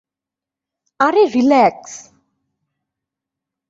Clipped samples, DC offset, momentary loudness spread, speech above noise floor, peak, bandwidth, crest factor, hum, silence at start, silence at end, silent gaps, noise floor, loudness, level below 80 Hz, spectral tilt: under 0.1%; under 0.1%; 22 LU; 73 dB; -2 dBFS; 7.8 kHz; 18 dB; none; 1 s; 1.7 s; none; -87 dBFS; -14 LUFS; -64 dBFS; -4.5 dB/octave